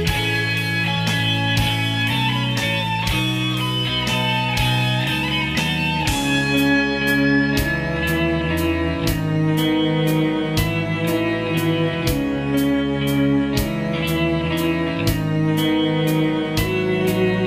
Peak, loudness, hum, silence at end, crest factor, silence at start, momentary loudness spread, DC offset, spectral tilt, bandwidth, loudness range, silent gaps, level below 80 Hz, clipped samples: -6 dBFS; -19 LUFS; none; 0 s; 14 dB; 0 s; 3 LU; under 0.1%; -5.5 dB/octave; 15.5 kHz; 2 LU; none; -36 dBFS; under 0.1%